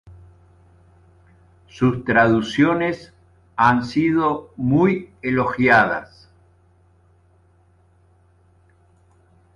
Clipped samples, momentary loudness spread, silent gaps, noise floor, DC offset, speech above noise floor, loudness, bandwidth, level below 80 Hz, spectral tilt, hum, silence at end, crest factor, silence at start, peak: under 0.1%; 10 LU; none; -56 dBFS; under 0.1%; 38 dB; -19 LUFS; 11 kHz; -52 dBFS; -7 dB/octave; none; 3.5 s; 20 dB; 0.05 s; -2 dBFS